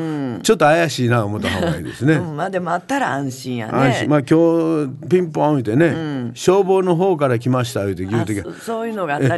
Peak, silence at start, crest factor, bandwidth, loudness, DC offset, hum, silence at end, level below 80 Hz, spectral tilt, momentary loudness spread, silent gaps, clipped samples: -4 dBFS; 0 s; 14 dB; 12.5 kHz; -18 LUFS; under 0.1%; none; 0 s; -46 dBFS; -6 dB/octave; 9 LU; none; under 0.1%